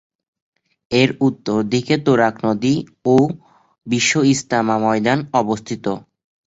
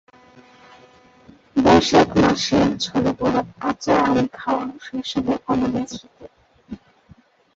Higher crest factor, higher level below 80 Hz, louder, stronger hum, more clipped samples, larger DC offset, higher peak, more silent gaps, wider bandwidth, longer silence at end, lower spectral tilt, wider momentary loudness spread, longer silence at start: about the same, 16 dB vs 18 dB; second, -54 dBFS vs -46 dBFS; about the same, -18 LUFS vs -19 LUFS; neither; neither; neither; about the same, -2 dBFS vs -2 dBFS; neither; about the same, 8 kHz vs 8 kHz; second, 0.45 s vs 0.8 s; about the same, -5 dB/octave vs -5 dB/octave; second, 8 LU vs 17 LU; second, 0.9 s vs 1.55 s